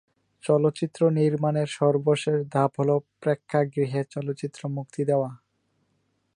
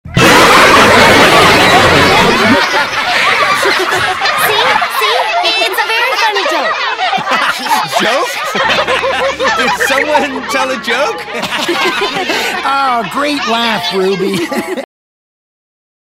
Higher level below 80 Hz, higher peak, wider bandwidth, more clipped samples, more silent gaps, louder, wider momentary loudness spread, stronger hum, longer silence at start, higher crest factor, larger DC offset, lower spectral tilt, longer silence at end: second, -72 dBFS vs -38 dBFS; second, -8 dBFS vs 0 dBFS; second, 10.5 kHz vs 18.5 kHz; second, under 0.1% vs 0.4%; neither; second, -25 LUFS vs -9 LUFS; about the same, 10 LU vs 10 LU; neither; first, 0.45 s vs 0.05 s; first, 18 dB vs 10 dB; neither; first, -7.5 dB/octave vs -3 dB/octave; second, 1 s vs 1.3 s